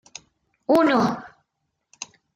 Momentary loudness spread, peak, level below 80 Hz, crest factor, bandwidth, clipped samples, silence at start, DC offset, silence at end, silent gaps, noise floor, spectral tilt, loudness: 24 LU; -6 dBFS; -66 dBFS; 18 dB; 14 kHz; under 0.1%; 0.7 s; under 0.1%; 0.3 s; none; -78 dBFS; -5 dB/octave; -20 LUFS